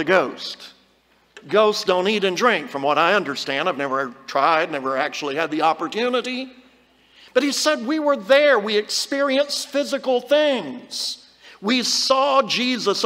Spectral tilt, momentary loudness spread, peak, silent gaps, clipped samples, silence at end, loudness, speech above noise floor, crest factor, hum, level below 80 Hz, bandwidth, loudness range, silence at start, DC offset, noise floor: -2.5 dB/octave; 9 LU; -2 dBFS; none; under 0.1%; 0 s; -20 LUFS; 39 dB; 18 dB; none; -70 dBFS; 16 kHz; 3 LU; 0 s; under 0.1%; -59 dBFS